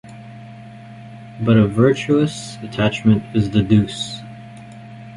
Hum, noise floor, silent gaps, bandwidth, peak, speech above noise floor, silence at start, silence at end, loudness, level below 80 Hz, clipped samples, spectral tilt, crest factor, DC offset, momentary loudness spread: none; -37 dBFS; none; 11.5 kHz; -2 dBFS; 21 dB; 0.05 s; 0 s; -17 LUFS; -44 dBFS; under 0.1%; -7 dB/octave; 18 dB; under 0.1%; 23 LU